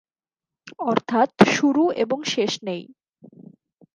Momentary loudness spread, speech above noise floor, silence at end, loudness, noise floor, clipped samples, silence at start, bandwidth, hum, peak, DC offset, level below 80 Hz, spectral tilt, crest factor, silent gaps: 12 LU; over 69 dB; 1.1 s; -21 LUFS; under -90 dBFS; under 0.1%; 0.65 s; 11 kHz; none; 0 dBFS; under 0.1%; -64 dBFS; -4.5 dB/octave; 22 dB; none